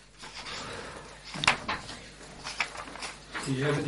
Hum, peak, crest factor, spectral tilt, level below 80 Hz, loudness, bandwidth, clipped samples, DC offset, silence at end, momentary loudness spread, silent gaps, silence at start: none; -6 dBFS; 28 dB; -3.5 dB/octave; -56 dBFS; -33 LUFS; 11.5 kHz; under 0.1%; under 0.1%; 0 s; 17 LU; none; 0 s